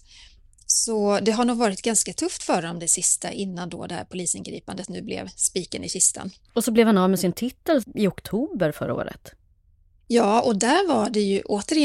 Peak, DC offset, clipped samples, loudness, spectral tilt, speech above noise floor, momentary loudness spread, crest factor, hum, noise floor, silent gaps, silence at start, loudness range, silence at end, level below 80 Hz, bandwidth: -4 dBFS; under 0.1%; under 0.1%; -23 LUFS; -3.5 dB/octave; 36 dB; 13 LU; 20 dB; none; -59 dBFS; none; 0.7 s; 4 LU; 0 s; -56 dBFS; 16.5 kHz